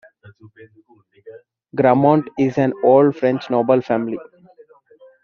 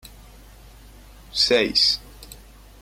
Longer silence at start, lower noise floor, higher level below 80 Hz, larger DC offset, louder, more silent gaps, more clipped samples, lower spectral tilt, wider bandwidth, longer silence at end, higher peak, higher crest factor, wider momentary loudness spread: first, 0.25 s vs 0.05 s; first, -50 dBFS vs -46 dBFS; second, -62 dBFS vs -46 dBFS; neither; about the same, -17 LUFS vs -19 LUFS; neither; neither; first, -7 dB/octave vs -2 dB/octave; second, 6.8 kHz vs 16.5 kHz; first, 1 s vs 0.45 s; first, -2 dBFS vs -6 dBFS; about the same, 18 dB vs 20 dB; second, 10 LU vs 24 LU